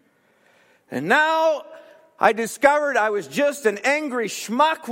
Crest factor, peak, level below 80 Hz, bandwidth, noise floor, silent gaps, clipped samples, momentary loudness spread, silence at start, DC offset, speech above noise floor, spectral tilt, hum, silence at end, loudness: 20 dB; 0 dBFS; -70 dBFS; 16.5 kHz; -60 dBFS; none; under 0.1%; 8 LU; 0.9 s; under 0.1%; 40 dB; -3 dB/octave; none; 0 s; -20 LUFS